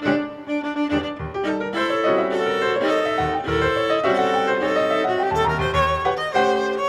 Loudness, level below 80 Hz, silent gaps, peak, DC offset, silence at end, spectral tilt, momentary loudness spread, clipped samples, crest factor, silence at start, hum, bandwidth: -21 LUFS; -42 dBFS; none; -6 dBFS; under 0.1%; 0 s; -5.5 dB/octave; 5 LU; under 0.1%; 14 dB; 0 s; none; 13.5 kHz